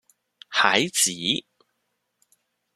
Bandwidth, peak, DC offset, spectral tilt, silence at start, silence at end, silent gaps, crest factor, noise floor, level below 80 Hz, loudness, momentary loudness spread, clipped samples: 14.5 kHz; -2 dBFS; under 0.1%; -1 dB/octave; 0.5 s; 1.35 s; none; 26 dB; -76 dBFS; -72 dBFS; -21 LUFS; 7 LU; under 0.1%